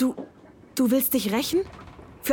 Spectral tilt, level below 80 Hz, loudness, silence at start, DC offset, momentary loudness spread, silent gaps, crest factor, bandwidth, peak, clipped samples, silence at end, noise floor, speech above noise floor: -4 dB/octave; -56 dBFS; -24 LUFS; 0 s; under 0.1%; 22 LU; none; 16 dB; 19.5 kHz; -10 dBFS; under 0.1%; 0 s; -50 dBFS; 27 dB